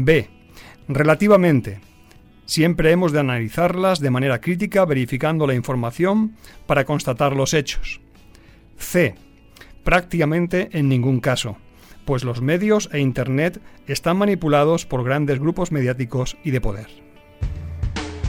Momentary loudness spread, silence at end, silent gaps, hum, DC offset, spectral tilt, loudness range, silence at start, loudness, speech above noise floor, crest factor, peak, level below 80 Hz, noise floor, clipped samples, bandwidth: 13 LU; 0 s; none; none; under 0.1%; -6 dB/octave; 4 LU; 0 s; -20 LUFS; 29 dB; 16 dB; -2 dBFS; -36 dBFS; -48 dBFS; under 0.1%; 17.5 kHz